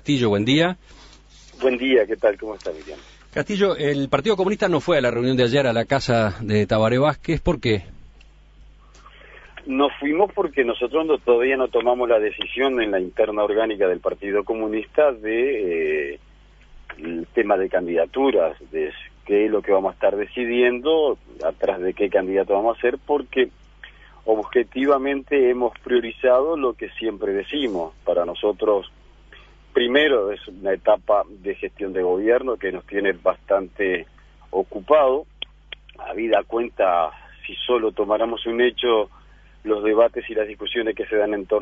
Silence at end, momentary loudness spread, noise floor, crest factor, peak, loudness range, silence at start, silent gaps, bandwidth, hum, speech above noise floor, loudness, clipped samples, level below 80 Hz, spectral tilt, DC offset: 0 s; 10 LU; -48 dBFS; 18 dB; -2 dBFS; 3 LU; 0.05 s; none; 8 kHz; none; 28 dB; -21 LUFS; under 0.1%; -48 dBFS; -6 dB/octave; under 0.1%